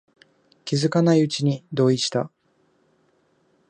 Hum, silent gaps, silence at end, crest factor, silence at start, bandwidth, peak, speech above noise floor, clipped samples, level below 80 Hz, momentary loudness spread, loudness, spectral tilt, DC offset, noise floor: none; none; 1.4 s; 18 dB; 0.65 s; 10 kHz; -6 dBFS; 44 dB; under 0.1%; -70 dBFS; 11 LU; -21 LUFS; -6 dB/octave; under 0.1%; -65 dBFS